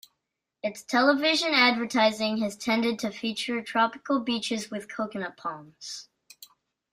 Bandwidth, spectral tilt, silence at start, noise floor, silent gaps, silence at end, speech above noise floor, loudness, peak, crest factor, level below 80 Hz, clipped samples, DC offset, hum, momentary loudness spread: 15.5 kHz; -3 dB/octave; 0.65 s; -83 dBFS; none; 0.45 s; 56 dB; -26 LUFS; -8 dBFS; 20 dB; -72 dBFS; under 0.1%; under 0.1%; none; 15 LU